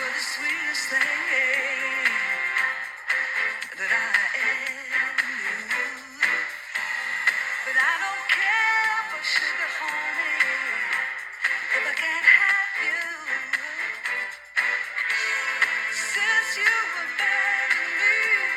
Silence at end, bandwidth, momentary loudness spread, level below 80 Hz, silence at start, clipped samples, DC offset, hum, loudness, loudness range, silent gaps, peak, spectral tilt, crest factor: 0 s; 16.5 kHz; 7 LU; -72 dBFS; 0 s; under 0.1%; under 0.1%; none; -23 LUFS; 3 LU; none; -4 dBFS; 1 dB/octave; 20 dB